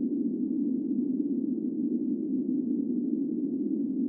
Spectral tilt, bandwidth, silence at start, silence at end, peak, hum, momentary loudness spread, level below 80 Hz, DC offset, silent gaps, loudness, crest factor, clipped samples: -17 dB/octave; 1 kHz; 0 s; 0 s; -16 dBFS; none; 1 LU; -88 dBFS; under 0.1%; none; -30 LUFS; 12 dB; under 0.1%